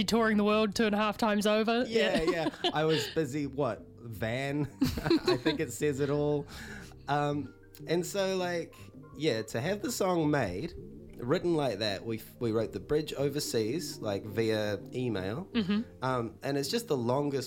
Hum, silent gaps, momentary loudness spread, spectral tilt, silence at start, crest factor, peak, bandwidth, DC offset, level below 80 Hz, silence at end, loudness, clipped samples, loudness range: none; none; 10 LU; -5 dB/octave; 0 s; 18 dB; -14 dBFS; 16.5 kHz; under 0.1%; -56 dBFS; 0 s; -31 LUFS; under 0.1%; 4 LU